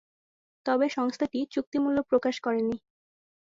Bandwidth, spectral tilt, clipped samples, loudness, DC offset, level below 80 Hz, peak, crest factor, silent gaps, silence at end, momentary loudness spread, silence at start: 7.6 kHz; -5 dB/octave; under 0.1%; -28 LUFS; under 0.1%; -66 dBFS; -12 dBFS; 16 dB; 1.67-1.72 s; 0.65 s; 6 LU; 0.65 s